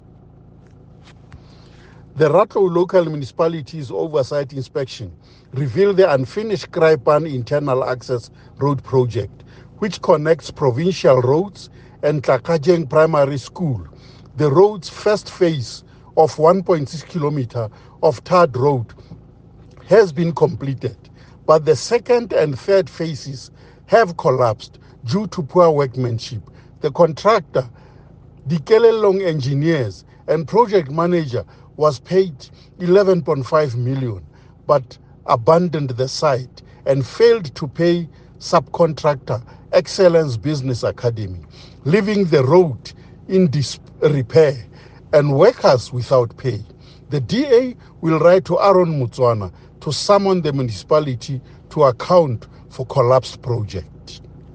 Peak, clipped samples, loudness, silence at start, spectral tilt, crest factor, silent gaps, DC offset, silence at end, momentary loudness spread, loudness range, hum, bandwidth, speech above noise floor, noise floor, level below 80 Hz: 0 dBFS; under 0.1%; -17 LUFS; 1.35 s; -7 dB/octave; 18 dB; none; under 0.1%; 0.05 s; 15 LU; 3 LU; none; 9.2 kHz; 28 dB; -44 dBFS; -50 dBFS